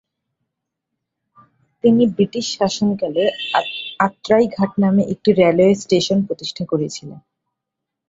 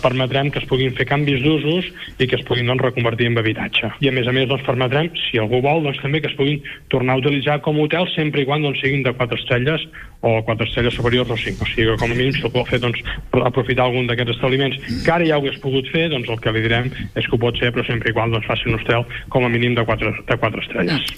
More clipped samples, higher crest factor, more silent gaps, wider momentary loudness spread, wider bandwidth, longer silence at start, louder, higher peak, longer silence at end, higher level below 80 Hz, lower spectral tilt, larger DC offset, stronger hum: neither; about the same, 18 dB vs 16 dB; neither; first, 8 LU vs 4 LU; second, 7.8 kHz vs 14 kHz; first, 1.85 s vs 0 s; about the same, -18 LUFS vs -19 LUFS; about the same, -2 dBFS vs -2 dBFS; first, 0.9 s vs 0 s; second, -58 dBFS vs -40 dBFS; second, -5.5 dB/octave vs -7 dB/octave; neither; neither